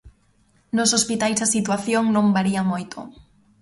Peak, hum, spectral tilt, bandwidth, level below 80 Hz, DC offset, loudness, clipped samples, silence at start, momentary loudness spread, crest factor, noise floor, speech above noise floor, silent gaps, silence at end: -6 dBFS; none; -3.5 dB/octave; 11.5 kHz; -56 dBFS; under 0.1%; -20 LUFS; under 0.1%; 0.05 s; 14 LU; 16 dB; -60 dBFS; 40 dB; none; 0.5 s